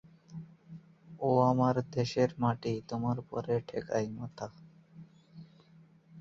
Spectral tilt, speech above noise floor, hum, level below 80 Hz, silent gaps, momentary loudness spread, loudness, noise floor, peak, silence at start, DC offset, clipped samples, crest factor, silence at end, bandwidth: -7.5 dB/octave; 29 dB; none; -66 dBFS; none; 22 LU; -32 LUFS; -60 dBFS; -14 dBFS; 0.3 s; under 0.1%; under 0.1%; 20 dB; 0 s; 7.6 kHz